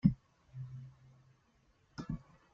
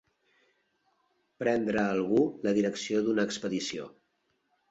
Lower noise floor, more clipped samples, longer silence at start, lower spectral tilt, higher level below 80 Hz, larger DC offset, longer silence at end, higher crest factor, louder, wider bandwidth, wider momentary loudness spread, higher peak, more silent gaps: second, -72 dBFS vs -76 dBFS; neither; second, 0.05 s vs 1.4 s; first, -9.5 dB/octave vs -5 dB/octave; first, -58 dBFS vs -68 dBFS; neither; second, 0.35 s vs 0.8 s; first, 26 dB vs 18 dB; second, -43 LUFS vs -29 LUFS; second, 7.2 kHz vs 8.2 kHz; first, 17 LU vs 8 LU; about the same, -14 dBFS vs -14 dBFS; neither